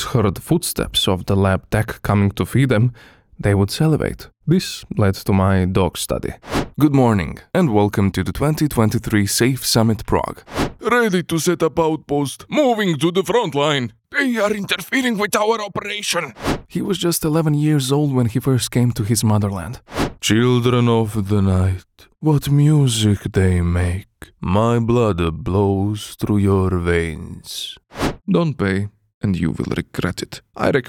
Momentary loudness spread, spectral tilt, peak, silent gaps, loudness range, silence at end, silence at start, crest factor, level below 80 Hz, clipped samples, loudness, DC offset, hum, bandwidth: 8 LU; -5.5 dB/octave; 0 dBFS; 29.14-29.21 s; 3 LU; 0 s; 0 s; 18 dB; -40 dBFS; under 0.1%; -18 LUFS; under 0.1%; none; 18 kHz